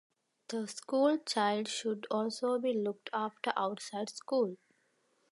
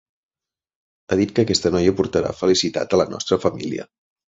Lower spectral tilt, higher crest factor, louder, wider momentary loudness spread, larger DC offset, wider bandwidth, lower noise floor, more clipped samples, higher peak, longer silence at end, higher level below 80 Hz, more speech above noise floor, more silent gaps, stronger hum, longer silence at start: about the same, -4 dB/octave vs -5 dB/octave; about the same, 20 dB vs 18 dB; second, -34 LUFS vs -20 LUFS; first, 10 LU vs 6 LU; neither; first, 11.5 kHz vs 8 kHz; second, -75 dBFS vs under -90 dBFS; neither; second, -14 dBFS vs -2 dBFS; first, 0.75 s vs 0.5 s; second, -90 dBFS vs -46 dBFS; second, 41 dB vs over 71 dB; neither; neither; second, 0.5 s vs 1.1 s